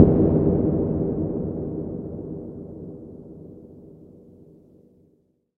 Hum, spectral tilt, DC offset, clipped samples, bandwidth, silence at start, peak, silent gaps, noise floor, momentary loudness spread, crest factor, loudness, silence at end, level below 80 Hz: none; -14.5 dB/octave; under 0.1%; under 0.1%; 2.5 kHz; 0 s; 0 dBFS; none; -64 dBFS; 24 LU; 24 dB; -24 LUFS; 1.55 s; -40 dBFS